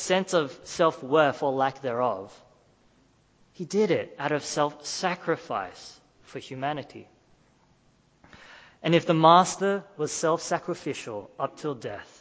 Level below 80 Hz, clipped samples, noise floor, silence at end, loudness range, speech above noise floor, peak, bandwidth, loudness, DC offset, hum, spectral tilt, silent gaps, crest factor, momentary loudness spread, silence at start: -68 dBFS; under 0.1%; -63 dBFS; 0.15 s; 10 LU; 37 dB; -4 dBFS; 8 kHz; -26 LUFS; under 0.1%; none; -4.5 dB/octave; none; 24 dB; 17 LU; 0 s